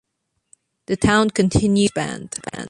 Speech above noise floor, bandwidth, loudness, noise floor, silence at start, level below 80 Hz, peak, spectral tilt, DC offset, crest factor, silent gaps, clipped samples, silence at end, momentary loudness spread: 56 dB; 11.5 kHz; -19 LUFS; -74 dBFS; 0.9 s; -40 dBFS; -2 dBFS; -5 dB/octave; under 0.1%; 18 dB; none; under 0.1%; 0 s; 12 LU